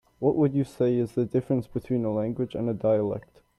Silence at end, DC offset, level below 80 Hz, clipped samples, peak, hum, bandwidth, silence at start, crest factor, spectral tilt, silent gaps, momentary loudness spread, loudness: 0.4 s; under 0.1%; -58 dBFS; under 0.1%; -10 dBFS; none; 12 kHz; 0.2 s; 16 dB; -9.5 dB/octave; none; 6 LU; -27 LUFS